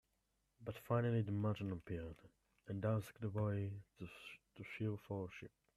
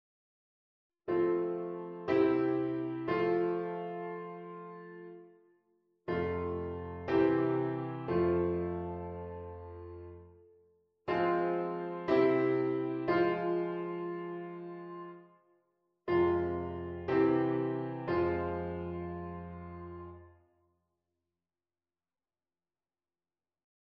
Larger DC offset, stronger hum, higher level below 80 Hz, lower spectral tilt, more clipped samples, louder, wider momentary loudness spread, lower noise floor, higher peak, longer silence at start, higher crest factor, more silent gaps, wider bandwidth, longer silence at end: neither; neither; second, -70 dBFS vs -60 dBFS; about the same, -8.5 dB/octave vs -9.5 dB/octave; neither; second, -43 LUFS vs -33 LUFS; about the same, 17 LU vs 18 LU; second, -84 dBFS vs under -90 dBFS; second, -24 dBFS vs -16 dBFS; second, 0.6 s vs 1.05 s; about the same, 20 dB vs 18 dB; neither; first, 13.5 kHz vs 5.6 kHz; second, 0.3 s vs 3.6 s